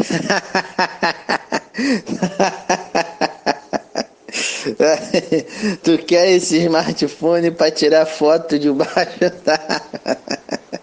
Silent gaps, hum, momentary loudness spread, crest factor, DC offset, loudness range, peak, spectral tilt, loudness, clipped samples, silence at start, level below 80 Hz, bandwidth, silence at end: none; none; 10 LU; 18 dB; under 0.1%; 5 LU; 0 dBFS; -4 dB/octave; -18 LUFS; under 0.1%; 0 s; -60 dBFS; 9.8 kHz; 0.05 s